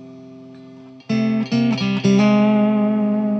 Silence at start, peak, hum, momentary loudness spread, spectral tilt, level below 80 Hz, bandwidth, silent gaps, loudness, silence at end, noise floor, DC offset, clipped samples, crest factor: 0 s; -6 dBFS; none; 5 LU; -7 dB/octave; -62 dBFS; 6.6 kHz; none; -17 LUFS; 0 s; -41 dBFS; under 0.1%; under 0.1%; 12 dB